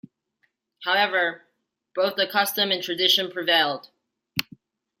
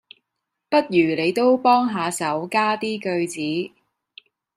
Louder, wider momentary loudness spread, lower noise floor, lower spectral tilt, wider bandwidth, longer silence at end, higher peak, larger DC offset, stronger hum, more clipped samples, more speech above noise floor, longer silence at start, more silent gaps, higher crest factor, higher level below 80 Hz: about the same, -22 LUFS vs -21 LUFS; first, 12 LU vs 8 LU; second, -72 dBFS vs -80 dBFS; second, -2 dB/octave vs -4.5 dB/octave; about the same, 16.5 kHz vs 15 kHz; second, 0.6 s vs 0.9 s; first, -2 dBFS vs -6 dBFS; neither; neither; neither; second, 49 dB vs 60 dB; about the same, 0.8 s vs 0.7 s; neither; first, 24 dB vs 16 dB; about the same, -72 dBFS vs -70 dBFS